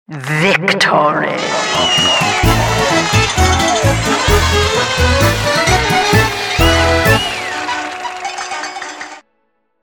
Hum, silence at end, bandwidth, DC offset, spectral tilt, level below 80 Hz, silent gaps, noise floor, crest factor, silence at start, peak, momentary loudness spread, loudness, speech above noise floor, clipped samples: none; 0.65 s; 19.5 kHz; under 0.1%; -3.5 dB/octave; -26 dBFS; none; -65 dBFS; 14 dB; 0.1 s; 0 dBFS; 11 LU; -13 LUFS; 52 dB; under 0.1%